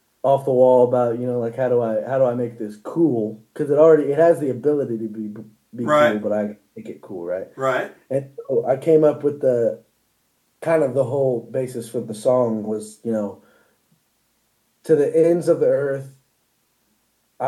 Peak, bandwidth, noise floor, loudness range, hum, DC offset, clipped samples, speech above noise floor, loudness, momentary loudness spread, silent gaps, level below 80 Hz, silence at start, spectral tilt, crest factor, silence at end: -2 dBFS; 12.5 kHz; -67 dBFS; 5 LU; none; under 0.1%; under 0.1%; 47 dB; -20 LUFS; 14 LU; none; -76 dBFS; 0.25 s; -7.5 dB/octave; 18 dB; 0 s